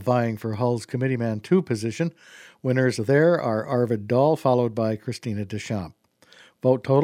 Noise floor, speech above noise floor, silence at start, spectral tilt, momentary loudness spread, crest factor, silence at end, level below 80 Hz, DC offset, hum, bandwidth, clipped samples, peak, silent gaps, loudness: -54 dBFS; 31 dB; 0 s; -7.5 dB/octave; 10 LU; 18 dB; 0 s; -64 dBFS; under 0.1%; none; 15.5 kHz; under 0.1%; -6 dBFS; none; -24 LUFS